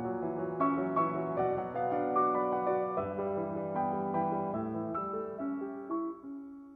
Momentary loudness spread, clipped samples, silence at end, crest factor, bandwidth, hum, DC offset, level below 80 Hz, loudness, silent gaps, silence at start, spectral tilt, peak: 8 LU; under 0.1%; 0 s; 16 dB; 3.9 kHz; none; under 0.1%; -70 dBFS; -33 LUFS; none; 0 s; -11 dB/octave; -18 dBFS